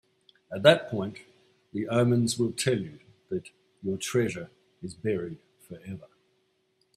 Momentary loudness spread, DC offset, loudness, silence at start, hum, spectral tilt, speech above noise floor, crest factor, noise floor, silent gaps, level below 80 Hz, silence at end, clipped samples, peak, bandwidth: 22 LU; under 0.1%; -28 LUFS; 0.5 s; none; -5 dB/octave; 44 dB; 26 dB; -72 dBFS; none; -68 dBFS; 0.9 s; under 0.1%; -4 dBFS; 14.5 kHz